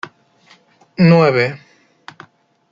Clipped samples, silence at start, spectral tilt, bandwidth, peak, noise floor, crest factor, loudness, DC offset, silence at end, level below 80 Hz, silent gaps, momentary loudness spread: under 0.1%; 1 s; -8.5 dB/octave; 7.2 kHz; -2 dBFS; -51 dBFS; 16 dB; -13 LUFS; under 0.1%; 1.15 s; -58 dBFS; none; 24 LU